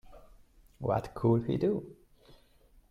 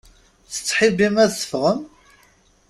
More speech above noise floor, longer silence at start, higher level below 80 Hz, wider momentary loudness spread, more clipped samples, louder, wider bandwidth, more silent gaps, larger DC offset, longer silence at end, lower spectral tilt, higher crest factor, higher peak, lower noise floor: second, 32 dB vs 38 dB; second, 0.1 s vs 0.5 s; about the same, -56 dBFS vs -56 dBFS; about the same, 10 LU vs 10 LU; neither; second, -31 LUFS vs -19 LUFS; second, 11.5 kHz vs 14.5 kHz; neither; neither; about the same, 0.95 s vs 0.85 s; first, -9.5 dB/octave vs -4 dB/octave; about the same, 18 dB vs 18 dB; second, -16 dBFS vs -2 dBFS; first, -62 dBFS vs -56 dBFS